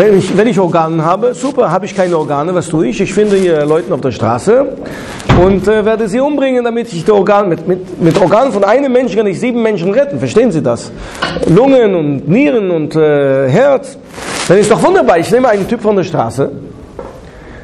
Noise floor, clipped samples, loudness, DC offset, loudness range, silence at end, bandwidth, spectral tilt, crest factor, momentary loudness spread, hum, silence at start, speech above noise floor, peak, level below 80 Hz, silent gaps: -31 dBFS; under 0.1%; -11 LUFS; under 0.1%; 2 LU; 0 s; 13 kHz; -6.5 dB/octave; 10 dB; 10 LU; none; 0 s; 21 dB; 0 dBFS; -34 dBFS; none